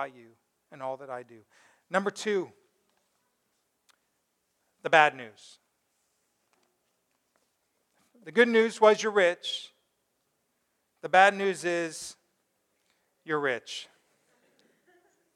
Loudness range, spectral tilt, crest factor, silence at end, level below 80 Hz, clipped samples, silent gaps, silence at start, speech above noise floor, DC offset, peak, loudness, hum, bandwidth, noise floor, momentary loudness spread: 10 LU; -3.5 dB/octave; 26 dB; 1.5 s; -86 dBFS; under 0.1%; none; 0 s; 50 dB; under 0.1%; -4 dBFS; -26 LUFS; none; 13 kHz; -77 dBFS; 20 LU